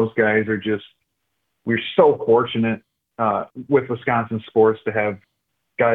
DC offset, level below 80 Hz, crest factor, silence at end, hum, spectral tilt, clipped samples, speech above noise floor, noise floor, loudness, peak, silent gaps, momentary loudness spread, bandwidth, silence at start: under 0.1%; -64 dBFS; 18 dB; 0 s; none; -9 dB/octave; under 0.1%; 56 dB; -75 dBFS; -20 LUFS; -2 dBFS; none; 10 LU; 4 kHz; 0 s